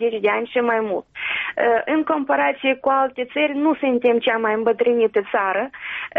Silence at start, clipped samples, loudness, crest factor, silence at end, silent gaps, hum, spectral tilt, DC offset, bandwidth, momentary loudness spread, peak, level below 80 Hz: 0 s; under 0.1%; -20 LUFS; 12 dB; 0 s; none; none; -1.5 dB/octave; under 0.1%; 3.9 kHz; 6 LU; -6 dBFS; -64 dBFS